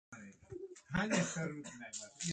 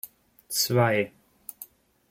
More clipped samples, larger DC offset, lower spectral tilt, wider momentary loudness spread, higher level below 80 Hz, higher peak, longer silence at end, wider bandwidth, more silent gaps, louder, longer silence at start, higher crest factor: neither; neither; about the same, -4 dB/octave vs -4 dB/octave; second, 18 LU vs 22 LU; about the same, -66 dBFS vs -66 dBFS; second, -22 dBFS vs -10 dBFS; second, 0 s vs 0.45 s; second, 9.4 kHz vs 16.5 kHz; neither; second, -39 LUFS vs -25 LUFS; about the same, 0.1 s vs 0.05 s; about the same, 20 dB vs 20 dB